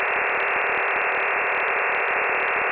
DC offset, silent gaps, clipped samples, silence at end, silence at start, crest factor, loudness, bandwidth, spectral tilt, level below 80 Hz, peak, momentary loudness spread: under 0.1%; none; under 0.1%; 0 s; 0 s; 12 dB; -21 LUFS; 4 kHz; 0.5 dB/octave; -62 dBFS; -12 dBFS; 0 LU